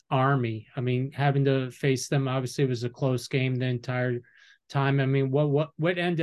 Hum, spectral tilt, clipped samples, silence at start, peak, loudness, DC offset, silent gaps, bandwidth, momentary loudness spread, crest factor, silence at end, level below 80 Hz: none; -6.5 dB/octave; under 0.1%; 0.1 s; -10 dBFS; -27 LUFS; under 0.1%; none; 12.5 kHz; 5 LU; 16 dB; 0 s; -66 dBFS